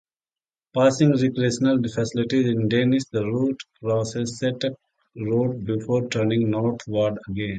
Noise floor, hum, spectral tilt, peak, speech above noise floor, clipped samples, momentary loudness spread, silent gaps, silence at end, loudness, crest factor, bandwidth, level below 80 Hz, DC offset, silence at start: under -90 dBFS; none; -6.5 dB/octave; -4 dBFS; over 68 dB; under 0.1%; 8 LU; none; 0 s; -23 LUFS; 18 dB; 9.2 kHz; -56 dBFS; under 0.1%; 0.75 s